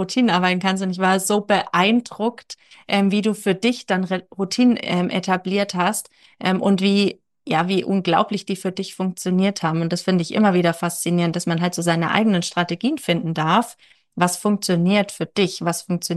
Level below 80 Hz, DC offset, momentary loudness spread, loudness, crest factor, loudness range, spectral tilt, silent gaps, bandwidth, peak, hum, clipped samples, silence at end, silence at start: -70 dBFS; under 0.1%; 8 LU; -20 LUFS; 16 dB; 1 LU; -5 dB/octave; none; 12.5 kHz; -4 dBFS; none; under 0.1%; 0 s; 0 s